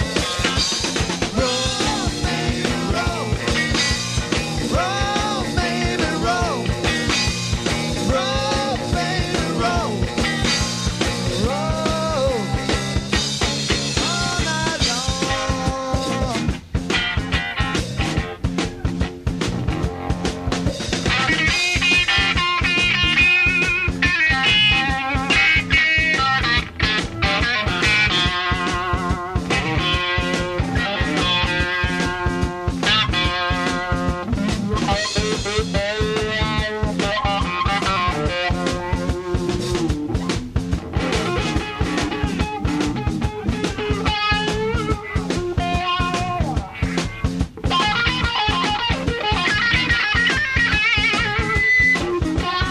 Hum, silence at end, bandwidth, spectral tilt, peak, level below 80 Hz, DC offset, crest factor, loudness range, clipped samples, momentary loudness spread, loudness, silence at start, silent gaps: none; 0 s; 14 kHz; -4 dB/octave; -4 dBFS; -30 dBFS; under 0.1%; 16 dB; 7 LU; under 0.1%; 8 LU; -19 LUFS; 0 s; none